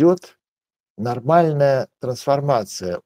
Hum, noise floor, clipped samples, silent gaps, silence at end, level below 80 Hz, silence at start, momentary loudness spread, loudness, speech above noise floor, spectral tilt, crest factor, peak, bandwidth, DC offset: none; under -90 dBFS; under 0.1%; 0.48-0.57 s, 0.80-0.95 s; 0.05 s; -62 dBFS; 0 s; 11 LU; -20 LUFS; over 71 dB; -7 dB/octave; 18 dB; 0 dBFS; 16 kHz; under 0.1%